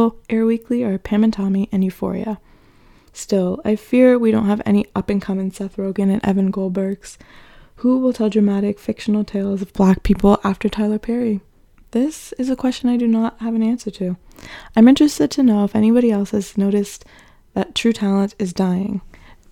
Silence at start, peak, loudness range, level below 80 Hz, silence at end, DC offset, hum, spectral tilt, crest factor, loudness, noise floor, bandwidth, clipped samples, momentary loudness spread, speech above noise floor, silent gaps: 0 s; 0 dBFS; 5 LU; -40 dBFS; 0.45 s; under 0.1%; none; -7 dB/octave; 18 dB; -18 LUFS; -49 dBFS; 14 kHz; under 0.1%; 11 LU; 32 dB; none